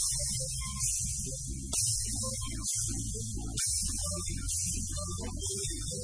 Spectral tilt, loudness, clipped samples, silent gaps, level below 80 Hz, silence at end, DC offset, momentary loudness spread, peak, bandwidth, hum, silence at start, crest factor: -2.5 dB/octave; -32 LUFS; under 0.1%; none; -42 dBFS; 0 s; 0.1%; 7 LU; -16 dBFS; 11 kHz; none; 0 s; 16 dB